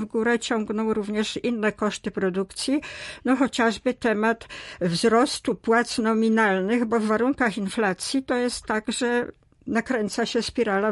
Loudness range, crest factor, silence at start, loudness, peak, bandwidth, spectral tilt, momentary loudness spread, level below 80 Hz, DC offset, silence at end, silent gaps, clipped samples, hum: 3 LU; 16 dB; 0 s; -24 LUFS; -8 dBFS; 11.5 kHz; -4.5 dB/octave; 7 LU; -56 dBFS; under 0.1%; 0 s; none; under 0.1%; none